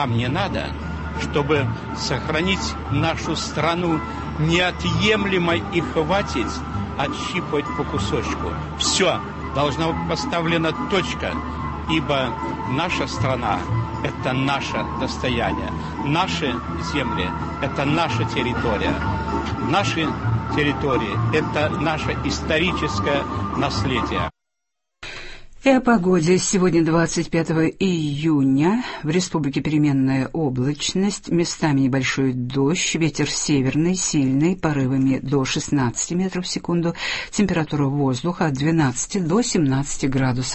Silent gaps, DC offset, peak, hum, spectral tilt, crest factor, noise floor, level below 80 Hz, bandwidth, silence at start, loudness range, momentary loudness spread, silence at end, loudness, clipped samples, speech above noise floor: none; under 0.1%; -2 dBFS; none; -5 dB/octave; 18 dB; -82 dBFS; -38 dBFS; 8.6 kHz; 0 s; 3 LU; 7 LU; 0 s; -21 LUFS; under 0.1%; 61 dB